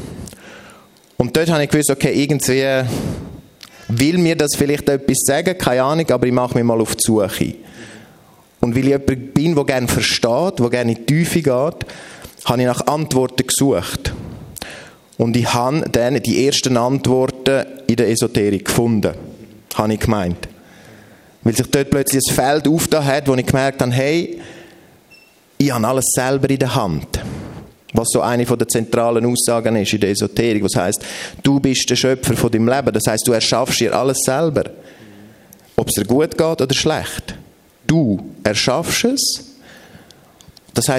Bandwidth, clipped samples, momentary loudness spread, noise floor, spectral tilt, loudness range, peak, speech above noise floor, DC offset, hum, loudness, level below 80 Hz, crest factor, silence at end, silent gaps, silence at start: 16 kHz; under 0.1%; 12 LU; -48 dBFS; -4.5 dB/octave; 3 LU; 0 dBFS; 32 dB; under 0.1%; none; -17 LUFS; -42 dBFS; 18 dB; 0 s; none; 0 s